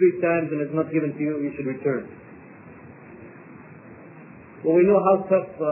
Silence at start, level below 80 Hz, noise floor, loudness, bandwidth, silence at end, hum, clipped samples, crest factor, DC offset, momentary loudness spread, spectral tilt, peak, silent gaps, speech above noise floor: 0 s; -62 dBFS; -44 dBFS; -22 LUFS; 2.9 kHz; 0 s; none; under 0.1%; 18 dB; under 0.1%; 26 LU; -13 dB/octave; -6 dBFS; none; 23 dB